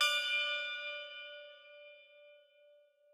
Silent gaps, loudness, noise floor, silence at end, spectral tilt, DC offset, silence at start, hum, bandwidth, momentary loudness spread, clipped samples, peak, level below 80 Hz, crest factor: none; -35 LUFS; -66 dBFS; 0.75 s; 6 dB/octave; under 0.1%; 0 s; none; 19 kHz; 24 LU; under 0.1%; -18 dBFS; under -90 dBFS; 22 dB